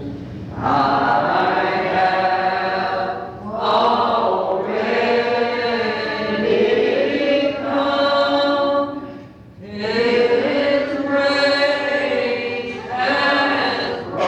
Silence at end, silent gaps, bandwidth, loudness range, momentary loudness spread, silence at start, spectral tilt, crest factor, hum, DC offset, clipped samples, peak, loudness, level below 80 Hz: 0 s; none; 9 kHz; 1 LU; 9 LU; 0 s; -5.5 dB/octave; 12 dB; none; under 0.1%; under 0.1%; -6 dBFS; -18 LUFS; -52 dBFS